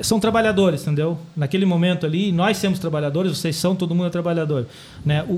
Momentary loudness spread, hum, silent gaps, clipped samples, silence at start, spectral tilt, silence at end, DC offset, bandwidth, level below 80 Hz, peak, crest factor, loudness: 7 LU; none; none; under 0.1%; 0 s; -6 dB/octave; 0 s; under 0.1%; 15.5 kHz; -50 dBFS; -6 dBFS; 14 dB; -20 LUFS